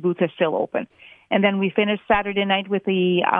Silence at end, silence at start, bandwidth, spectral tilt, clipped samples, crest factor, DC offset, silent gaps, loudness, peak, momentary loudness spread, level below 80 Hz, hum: 0 s; 0 s; 3.8 kHz; -9 dB/octave; under 0.1%; 20 dB; under 0.1%; none; -21 LUFS; -2 dBFS; 6 LU; -52 dBFS; none